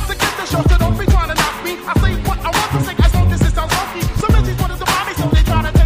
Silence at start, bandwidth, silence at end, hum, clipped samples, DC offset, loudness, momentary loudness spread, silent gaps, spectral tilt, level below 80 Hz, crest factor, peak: 0 s; 15.5 kHz; 0 s; none; under 0.1%; under 0.1%; -16 LUFS; 4 LU; none; -5 dB/octave; -18 dBFS; 14 dB; 0 dBFS